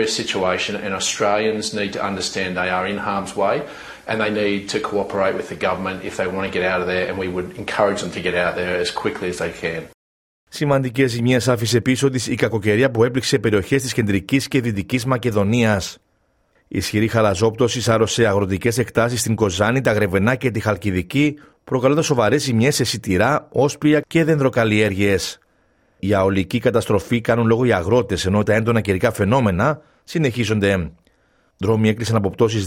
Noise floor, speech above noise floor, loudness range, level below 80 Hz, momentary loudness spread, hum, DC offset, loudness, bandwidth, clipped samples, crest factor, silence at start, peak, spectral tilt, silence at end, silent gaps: -63 dBFS; 45 dB; 4 LU; -50 dBFS; 7 LU; none; under 0.1%; -19 LUFS; 16.5 kHz; under 0.1%; 18 dB; 0 s; -2 dBFS; -5 dB/octave; 0 s; 9.94-10.47 s